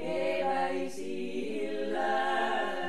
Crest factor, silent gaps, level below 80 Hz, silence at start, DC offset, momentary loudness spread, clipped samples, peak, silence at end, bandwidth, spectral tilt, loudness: 14 dB; none; -70 dBFS; 0 s; 1%; 7 LU; under 0.1%; -16 dBFS; 0 s; 13 kHz; -4.5 dB/octave; -32 LUFS